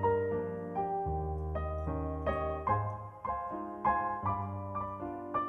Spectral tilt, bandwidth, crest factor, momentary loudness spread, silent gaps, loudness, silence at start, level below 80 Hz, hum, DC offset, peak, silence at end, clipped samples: -10 dB/octave; 4 kHz; 16 dB; 7 LU; none; -35 LUFS; 0 s; -46 dBFS; none; under 0.1%; -18 dBFS; 0 s; under 0.1%